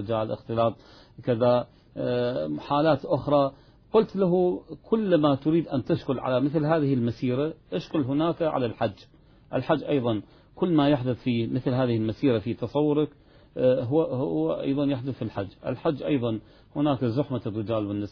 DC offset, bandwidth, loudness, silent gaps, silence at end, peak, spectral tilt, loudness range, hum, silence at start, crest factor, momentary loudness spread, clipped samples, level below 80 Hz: under 0.1%; 5.4 kHz; -26 LUFS; none; 0 s; -8 dBFS; -9.5 dB/octave; 3 LU; none; 0 s; 18 dB; 9 LU; under 0.1%; -56 dBFS